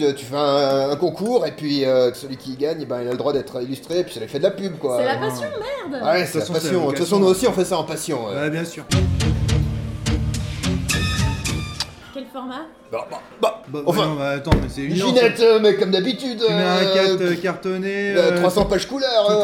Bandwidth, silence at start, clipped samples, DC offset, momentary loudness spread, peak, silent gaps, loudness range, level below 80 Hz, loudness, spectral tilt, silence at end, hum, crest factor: 17 kHz; 0 s; under 0.1%; under 0.1%; 11 LU; -2 dBFS; none; 7 LU; -36 dBFS; -20 LUFS; -5 dB/octave; 0 s; none; 18 dB